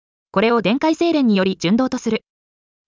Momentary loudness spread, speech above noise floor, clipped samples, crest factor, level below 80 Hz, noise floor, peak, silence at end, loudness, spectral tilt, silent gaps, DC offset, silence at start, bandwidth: 8 LU; over 73 dB; under 0.1%; 14 dB; -56 dBFS; under -90 dBFS; -4 dBFS; 0.7 s; -18 LUFS; -6 dB/octave; none; under 0.1%; 0.35 s; 7.6 kHz